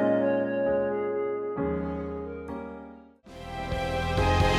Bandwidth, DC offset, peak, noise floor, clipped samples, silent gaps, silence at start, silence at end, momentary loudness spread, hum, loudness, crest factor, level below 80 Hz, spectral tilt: 14 kHz; under 0.1%; -12 dBFS; -48 dBFS; under 0.1%; none; 0 s; 0 s; 16 LU; none; -29 LUFS; 14 dB; -40 dBFS; -6.5 dB/octave